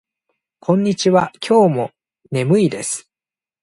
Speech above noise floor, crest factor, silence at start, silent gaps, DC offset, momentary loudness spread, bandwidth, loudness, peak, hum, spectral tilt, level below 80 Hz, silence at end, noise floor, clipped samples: over 74 dB; 16 dB; 0.7 s; none; under 0.1%; 12 LU; 11.5 kHz; -17 LUFS; -2 dBFS; none; -5.5 dB/octave; -60 dBFS; 0.65 s; under -90 dBFS; under 0.1%